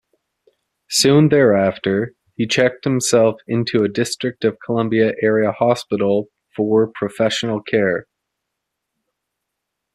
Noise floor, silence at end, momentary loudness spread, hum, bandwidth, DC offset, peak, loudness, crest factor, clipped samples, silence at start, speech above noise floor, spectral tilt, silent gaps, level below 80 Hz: -79 dBFS; 1.95 s; 9 LU; none; 14 kHz; under 0.1%; -2 dBFS; -17 LUFS; 16 dB; under 0.1%; 0.9 s; 62 dB; -5 dB/octave; none; -58 dBFS